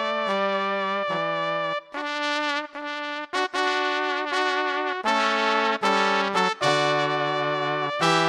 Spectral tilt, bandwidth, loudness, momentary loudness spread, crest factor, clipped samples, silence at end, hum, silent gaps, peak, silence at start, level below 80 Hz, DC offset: -3.5 dB/octave; 13 kHz; -24 LUFS; 7 LU; 20 dB; under 0.1%; 0 s; none; none; -4 dBFS; 0 s; -72 dBFS; under 0.1%